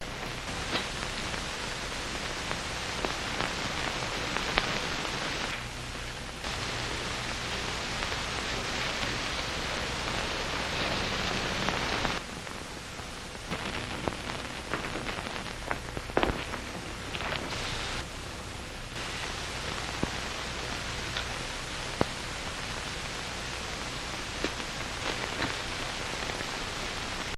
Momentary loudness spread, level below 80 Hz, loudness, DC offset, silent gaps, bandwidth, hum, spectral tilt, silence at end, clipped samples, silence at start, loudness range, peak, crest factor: 7 LU; -44 dBFS; -33 LUFS; under 0.1%; none; 16 kHz; none; -3 dB/octave; 0 s; under 0.1%; 0 s; 4 LU; 0 dBFS; 34 dB